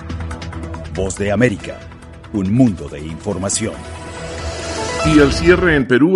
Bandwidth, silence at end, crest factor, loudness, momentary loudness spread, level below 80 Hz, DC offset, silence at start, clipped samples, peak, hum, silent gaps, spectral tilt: 11.5 kHz; 0 s; 16 dB; -17 LUFS; 17 LU; -32 dBFS; under 0.1%; 0 s; under 0.1%; 0 dBFS; none; none; -5 dB/octave